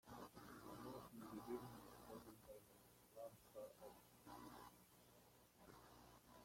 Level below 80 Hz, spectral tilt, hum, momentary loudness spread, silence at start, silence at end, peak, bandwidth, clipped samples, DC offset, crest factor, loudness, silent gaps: -78 dBFS; -5 dB/octave; 60 Hz at -75 dBFS; 15 LU; 0.05 s; 0 s; -40 dBFS; 16.5 kHz; under 0.1%; under 0.1%; 20 dB; -60 LUFS; none